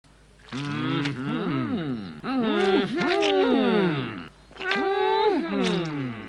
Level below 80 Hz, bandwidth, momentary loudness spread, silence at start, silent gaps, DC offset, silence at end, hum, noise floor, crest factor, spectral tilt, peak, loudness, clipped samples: -58 dBFS; 10.5 kHz; 12 LU; 0.45 s; none; under 0.1%; 0 s; none; -46 dBFS; 16 dB; -6 dB/octave; -10 dBFS; -25 LUFS; under 0.1%